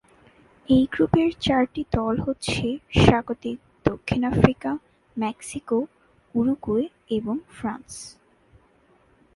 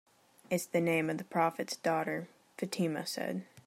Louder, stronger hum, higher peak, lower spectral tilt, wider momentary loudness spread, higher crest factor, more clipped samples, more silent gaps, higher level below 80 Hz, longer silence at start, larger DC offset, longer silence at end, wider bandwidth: first, -24 LUFS vs -34 LUFS; neither; first, -2 dBFS vs -16 dBFS; first, -6.5 dB/octave vs -5 dB/octave; first, 15 LU vs 8 LU; about the same, 24 dB vs 20 dB; neither; neither; first, -42 dBFS vs -82 dBFS; first, 0.7 s vs 0.5 s; neither; first, 1.25 s vs 0.05 s; second, 11.5 kHz vs 16 kHz